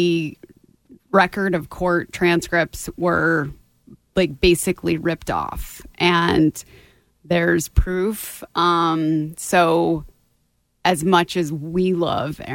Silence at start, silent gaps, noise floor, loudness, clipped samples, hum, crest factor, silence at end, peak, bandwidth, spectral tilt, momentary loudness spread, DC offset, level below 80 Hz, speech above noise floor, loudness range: 0 s; none; -66 dBFS; -20 LUFS; under 0.1%; none; 18 dB; 0 s; -2 dBFS; 17 kHz; -5 dB/octave; 9 LU; under 0.1%; -36 dBFS; 47 dB; 1 LU